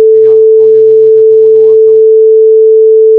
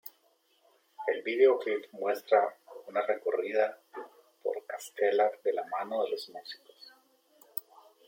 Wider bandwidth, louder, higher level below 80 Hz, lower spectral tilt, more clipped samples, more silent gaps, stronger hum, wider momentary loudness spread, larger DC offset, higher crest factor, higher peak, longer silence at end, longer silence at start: second, 1.2 kHz vs 16.5 kHz; first, -4 LUFS vs -31 LUFS; first, -64 dBFS vs under -90 dBFS; first, -9 dB/octave vs -3 dB/octave; first, 2% vs under 0.1%; neither; neither; second, 0 LU vs 21 LU; first, 0.1% vs under 0.1%; second, 4 dB vs 20 dB; first, 0 dBFS vs -12 dBFS; second, 0 s vs 0.45 s; about the same, 0 s vs 0.05 s